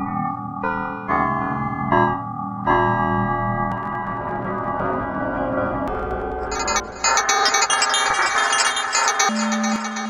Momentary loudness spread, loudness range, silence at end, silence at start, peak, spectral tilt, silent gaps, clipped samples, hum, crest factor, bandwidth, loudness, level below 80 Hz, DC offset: 9 LU; 6 LU; 0 s; 0 s; -2 dBFS; -3 dB/octave; none; under 0.1%; none; 20 dB; 14.5 kHz; -20 LUFS; -42 dBFS; under 0.1%